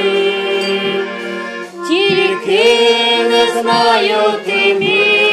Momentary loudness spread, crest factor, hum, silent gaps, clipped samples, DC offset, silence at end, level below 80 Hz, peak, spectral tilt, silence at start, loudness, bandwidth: 11 LU; 12 dB; none; none; under 0.1%; under 0.1%; 0 s; -60 dBFS; -2 dBFS; -3.5 dB/octave; 0 s; -12 LUFS; 14 kHz